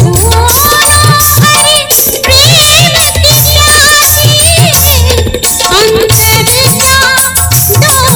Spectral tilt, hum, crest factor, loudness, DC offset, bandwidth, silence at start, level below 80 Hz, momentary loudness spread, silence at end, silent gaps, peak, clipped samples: -2.5 dB/octave; none; 6 dB; -3 LUFS; under 0.1%; over 20 kHz; 0 s; -20 dBFS; 4 LU; 0 s; none; 0 dBFS; 5%